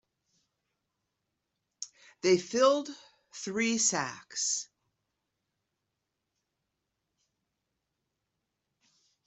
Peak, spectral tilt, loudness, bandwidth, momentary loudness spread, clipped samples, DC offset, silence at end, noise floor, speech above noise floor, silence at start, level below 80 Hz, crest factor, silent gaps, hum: -12 dBFS; -2.5 dB/octave; -29 LUFS; 8.2 kHz; 19 LU; under 0.1%; under 0.1%; 4.6 s; -85 dBFS; 56 dB; 1.8 s; -80 dBFS; 24 dB; none; none